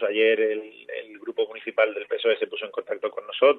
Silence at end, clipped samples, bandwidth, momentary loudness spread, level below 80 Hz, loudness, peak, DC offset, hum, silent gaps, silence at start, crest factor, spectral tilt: 0 s; under 0.1%; 4.3 kHz; 14 LU; -84 dBFS; -25 LUFS; -6 dBFS; under 0.1%; none; none; 0 s; 18 dB; -5.5 dB/octave